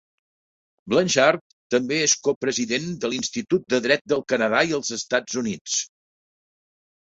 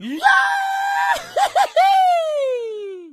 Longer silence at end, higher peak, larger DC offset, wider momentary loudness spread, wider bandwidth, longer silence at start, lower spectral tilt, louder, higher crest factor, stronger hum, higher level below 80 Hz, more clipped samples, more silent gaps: first, 1.2 s vs 0 s; about the same, -2 dBFS vs 0 dBFS; neither; about the same, 8 LU vs 10 LU; second, 8 kHz vs 14.5 kHz; first, 0.85 s vs 0 s; first, -3 dB/octave vs -1 dB/octave; second, -22 LUFS vs -17 LUFS; about the same, 22 dB vs 18 dB; neither; about the same, -64 dBFS vs -64 dBFS; neither; first, 1.41-1.70 s, 2.36-2.41 s, 4.01-4.05 s, 5.61-5.65 s vs none